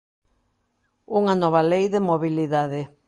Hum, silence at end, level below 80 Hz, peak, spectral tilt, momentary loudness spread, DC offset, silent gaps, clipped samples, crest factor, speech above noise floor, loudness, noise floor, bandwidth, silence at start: none; 0.2 s; -66 dBFS; -6 dBFS; -7.5 dB/octave; 5 LU; under 0.1%; none; under 0.1%; 18 dB; 50 dB; -21 LUFS; -71 dBFS; 11 kHz; 1.1 s